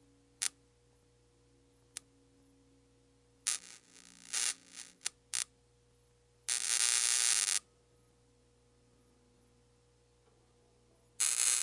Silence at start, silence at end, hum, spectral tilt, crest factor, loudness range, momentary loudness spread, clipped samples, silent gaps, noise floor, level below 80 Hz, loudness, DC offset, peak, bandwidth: 0.4 s; 0 s; none; 3 dB/octave; 32 dB; 12 LU; 22 LU; under 0.1%; none; -69 dBFS; -76 dBFS; -32 LUFS; under 0.1%; -8 dBFS; 11.5 kHz